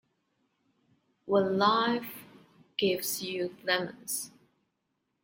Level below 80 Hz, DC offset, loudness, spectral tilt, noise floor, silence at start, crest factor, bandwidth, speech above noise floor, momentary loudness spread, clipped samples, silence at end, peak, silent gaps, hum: -76 dBFS; under 0.1%; -30 LUFS; -3.5 dB/octave; -80 dBFS; 1.25 s; 22 dB; 16.5 kHz; 51 dB; 18 LU; under 0.1%; 0.95 s; -10 dBFS; none; none